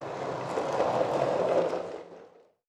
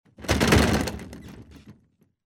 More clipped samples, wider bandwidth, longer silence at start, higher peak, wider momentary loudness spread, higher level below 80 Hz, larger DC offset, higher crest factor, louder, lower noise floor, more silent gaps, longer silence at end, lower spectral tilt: neither; second, 11.5 kHz vs 17 kHz; second, 0 s vs 0.2 s; second, -12 dBFS vs -8 dBFS; second, 13 LU vs 24 LU; second, -68 dBFS vs -36 dBFS; neither; about the same, 18 dB vs 18 dB; second, -29 LUFS vs -22 LUFS; second, -55 dBFS vs -63 dBFS; neither; second, 0.4 s vs 0.55 s; about the same, -5.5 dB/octave vs -5 dB/octave